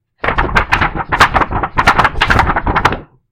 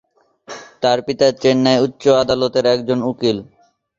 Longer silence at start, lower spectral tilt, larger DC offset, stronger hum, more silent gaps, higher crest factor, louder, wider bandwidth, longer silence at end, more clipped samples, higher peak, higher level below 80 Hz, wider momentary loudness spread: second, 0.25 s vs 0.5 s; about the same, -4.5 dB/octave vs -5.5 dB/octave; neither; neither; neither; about the same, 14 dB vs 16 dB; first, -13 LUFS vs -16 LUFS; first, 17 kHz vs 7.6 kHz; second, 0.25 s vs 0.55 s; first, 0.4% vs under 0.1%; about the same, 0 dBFS vs -2 dBFS; first, -22 dBFS vs -52 dBFS; second, 6 LU vs 11 LU